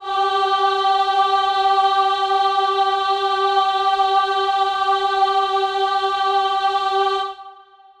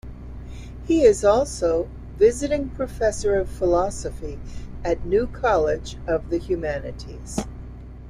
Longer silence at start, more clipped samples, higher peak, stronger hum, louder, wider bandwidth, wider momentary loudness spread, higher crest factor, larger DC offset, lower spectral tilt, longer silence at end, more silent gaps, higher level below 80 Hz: about the same, 0 s vs 0.05 s; neither; about the same, -6 dBFS vs -4 dBFS; neither; first, -18 LUFS vs -22 LUFS; second, 10.5 kHz vs 14 kHz; second, 2 LU vs 19 LU; second, 12 dB vs 18 dB; neither; second, -1.5 dB/octave vs -5.5 dB/octave; first, 0.45 s vs 0 s; neither; second, -60 dBFS vs -36 dBFS